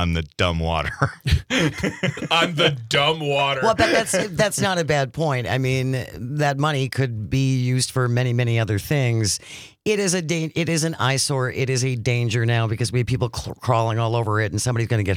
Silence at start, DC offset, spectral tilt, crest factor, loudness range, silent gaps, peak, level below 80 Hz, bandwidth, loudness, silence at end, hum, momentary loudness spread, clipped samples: 0 s; under 0.1%; -4.5 dB/octave; 18 dB; 2 LU; none; -4 dBFS; -42 dBFS; 16 kHz; -21 LUFS; 0 s; none; 5 LU; under 0.1%